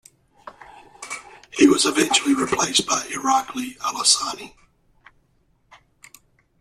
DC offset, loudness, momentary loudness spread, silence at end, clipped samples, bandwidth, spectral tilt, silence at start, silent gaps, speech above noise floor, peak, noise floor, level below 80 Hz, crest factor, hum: under 0.1%; -19 LUFS; 18 LU; 2.1 s; under 0.1%; 14.5 kHz; -1.5 dB/octave; 0.45 s; none; 42 dB; -2 dBFS; -63 dBFS; -60 dBFS; 22 dB; none